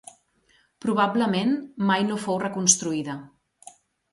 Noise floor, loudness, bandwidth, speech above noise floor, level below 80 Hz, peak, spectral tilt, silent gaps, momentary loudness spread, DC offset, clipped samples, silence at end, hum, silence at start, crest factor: -64 dBFS; -23 LUFS; 11.5 kHz; 40 dB; -68 dBFS; -4 dBFS; -3.5 dB/octave; none; 12 LU; under 0.1%; under 0.1%; 0.85 s; none; 0.85 s; 22 dB